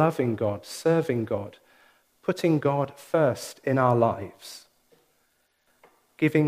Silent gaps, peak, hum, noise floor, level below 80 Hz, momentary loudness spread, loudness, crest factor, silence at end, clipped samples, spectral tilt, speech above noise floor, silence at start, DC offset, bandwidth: none; -8 dBFS; none; -70 dBFS; -68 dBFS; 16 LU; -26 LUFS; 18 dB; 0 s; under 0.1%; -7 dB/octave; 45 dB; 0 s; under 0.1%; 15.5 kHz